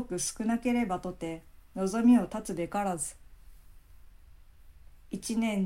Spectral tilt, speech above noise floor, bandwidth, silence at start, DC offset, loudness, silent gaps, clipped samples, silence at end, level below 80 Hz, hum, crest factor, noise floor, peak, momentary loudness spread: -5 dB/octave; 24 dB; 15.5 kHz; 0 s; under 0.1%; -30 LUFS; none; under 0.1%; 0 s; -54 dBFS; none; 18 dB; -53 dBFS; -14 dBFS; 16 LU